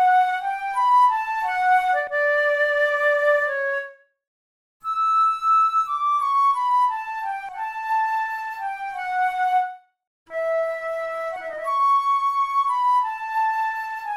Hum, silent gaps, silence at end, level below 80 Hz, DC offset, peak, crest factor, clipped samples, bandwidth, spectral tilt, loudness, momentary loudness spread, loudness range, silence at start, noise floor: none; 4.27-4.80 s, 10.07-10.26 s; 0 s; -64 dBFS; under 0.1%; -8 dBFS; 14 dB; under 0.1%; 14.5 kHz; -0.5 dB/octave; -21 LUFS; 11 LU; 6 LU; 0 s; under -90 dBFS